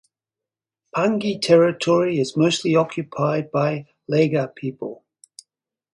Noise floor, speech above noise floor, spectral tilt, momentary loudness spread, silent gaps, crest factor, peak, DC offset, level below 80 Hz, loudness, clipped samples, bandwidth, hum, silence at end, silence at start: -88 dBFS; 69 dB; -6 dB/octave; 14 LU; none; 18 dB; -4 dBFS; under 0.1%; -66 dBFS; -20 LUFS; under 0.1%; 11.5 kHz; none; 1 s; 0.95 s